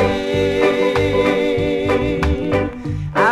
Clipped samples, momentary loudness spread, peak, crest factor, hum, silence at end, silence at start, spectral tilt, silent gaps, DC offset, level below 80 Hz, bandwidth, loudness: under 0.1%; 5 LU; -2 dBFS; 16 dB; none; 0 s; 0 s; -6.5 dB/octave; none; under 0.1%; -30 dBFS; 13.5 kHz; -18 LUFS